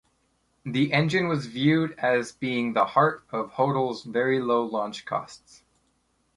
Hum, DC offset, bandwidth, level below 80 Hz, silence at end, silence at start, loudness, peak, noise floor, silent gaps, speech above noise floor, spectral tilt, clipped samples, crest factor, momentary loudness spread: none; under 0.1%; 11.5 kHz; -66 dBFS; 1 s; 0.65 s; -25 LUFS; -6 dBFS; -70 dBFS; none; 45 dB; -6.5 dB/octave; under 0.1%; 20 dB; 10 LU